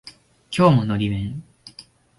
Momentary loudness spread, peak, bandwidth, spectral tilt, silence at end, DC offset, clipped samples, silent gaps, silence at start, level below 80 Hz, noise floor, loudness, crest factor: 25 LU; -4 dBFS; 11.5 kHz; -7.5 dB/octave; 0.35 s; under 0.1%; under 0.1%; none; 0.05 s; -46 dBFS; -48 dBFS; -20 LUFS; 18 dB